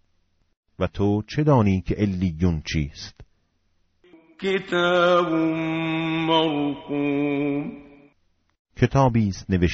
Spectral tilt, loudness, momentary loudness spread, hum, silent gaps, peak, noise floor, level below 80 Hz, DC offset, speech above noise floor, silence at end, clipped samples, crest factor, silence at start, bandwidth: -5.5 dB/octave; -23 LUFS; 10 LU; none; 8.59-8.65 s; -4 dBFS; -67 dBFS; -42 dBFS; under 0.1%; 45 dB; 0 s; under 0.1%; 20 dB; 0.8 s; 7.6 kHz